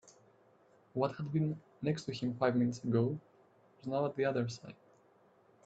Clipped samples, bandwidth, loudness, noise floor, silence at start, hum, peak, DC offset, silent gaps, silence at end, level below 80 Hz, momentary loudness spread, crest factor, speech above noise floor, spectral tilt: under 0.1%; 8.2 kHz; -35 LUFS; -67 dBFS; 0.05 s; none; -16 dBFS; under 0.1%; none; 0.9 s; -74 dBFS; 12 LU; 20 dB; 32 dB; -7.5 dB/octave